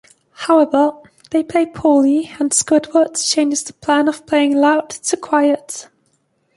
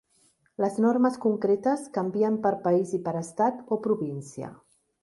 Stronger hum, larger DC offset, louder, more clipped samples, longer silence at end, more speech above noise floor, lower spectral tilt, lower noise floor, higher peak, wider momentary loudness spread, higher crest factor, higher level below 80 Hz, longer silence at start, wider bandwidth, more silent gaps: neither; neither; first, -16 LUFS vs -26 LUFS; neither; first, 0.75 s vs 0.5 s; first, 48 dB vs 40 dB; second, -2.5 dB/octave vs -7.5 dB/octave; about the same, -63 dBFS vs -66 dBFS; first, -2 dBFS vs -12 dBFS; second, 8 LU vs 13 LU; about the same, 14 dB vs 16 dB; first, -58 dBFS vs -72 dBFS; second, 0.4 s vs 0.6 s; about the same, 11.5 kHz vs 11.5 kHz; neither